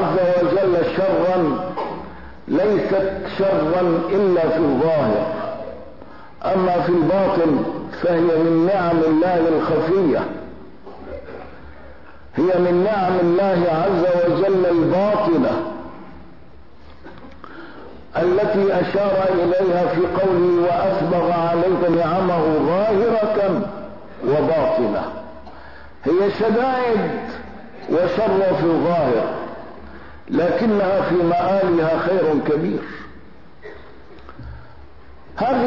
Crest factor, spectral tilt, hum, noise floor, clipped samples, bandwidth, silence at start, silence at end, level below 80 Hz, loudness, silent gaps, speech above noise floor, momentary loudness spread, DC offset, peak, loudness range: 10 dB; -9 dB/octave; none; -46 dBFS; under 0.1%; 6 kHz; 0 s; 0 s; -48 dBFS; -18 LUFS; none; 28 dB; 19 LU; 1%; -8 dBFS; 5 LU